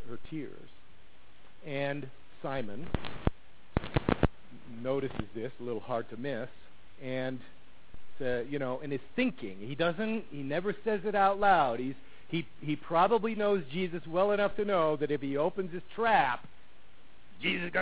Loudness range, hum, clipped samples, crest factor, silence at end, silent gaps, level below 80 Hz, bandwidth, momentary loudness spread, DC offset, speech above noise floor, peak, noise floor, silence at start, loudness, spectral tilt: 9 LU; none; under 0.1%; 26 dB; 0 s; none; -50 dBFS; 4 kHz; 14 LU; 0.9%; 29 dB; -8 dBFS; -60 dBFS; 0 s; -32 LUFS; -4.5 dB/octave